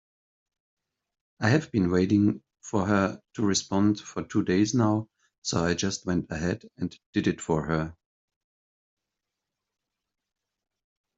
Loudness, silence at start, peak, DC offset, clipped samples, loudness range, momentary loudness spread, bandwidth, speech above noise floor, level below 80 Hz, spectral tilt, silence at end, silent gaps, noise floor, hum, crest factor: -27 LUFS; 1.4 s; -8 dBFS; under 0.1%; under 0.1%; 7 LU; 9 LU; 8 kHz; 60 dB; -58 dBFS; -5.5 dB/octave; 3.25 s; 5.38-5.42 s, 7.06-7.13 s; -86 dBFS; none; 20 dB